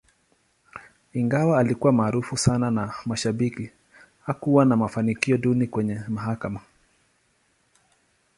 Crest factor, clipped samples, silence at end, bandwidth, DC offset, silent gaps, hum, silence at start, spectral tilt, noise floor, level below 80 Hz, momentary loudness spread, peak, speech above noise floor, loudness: 20 dB; under 0.1%; 1.8 s; 11.5 kHz; under 0.1%; none; none; 0.75 s; -6.5 dB/octave; -67 dBFS; -54 dBFS; 18 LU; -4 dBFS; 44 dB; -23 LUFS